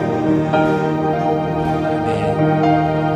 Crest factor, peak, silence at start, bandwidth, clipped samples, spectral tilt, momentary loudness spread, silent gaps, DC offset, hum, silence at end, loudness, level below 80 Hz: 14 dB; -2 dBFS; 0 s; 9.6 kHz; under 0.1%; -8 dB/octave; 4 LU; none; under 0.1%; none; 0 s; -17 LUFS; -42 dBFS